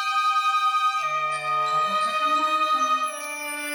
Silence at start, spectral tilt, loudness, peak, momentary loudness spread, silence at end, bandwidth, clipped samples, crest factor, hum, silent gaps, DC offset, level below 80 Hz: 0 s; -1 dB/octave; -23 LUFS; -12 dBFS; 6 LU; 0 s; over 20 kHz; under 0.1%; 10 dB; none; none; under 0.1%; -86 dBFS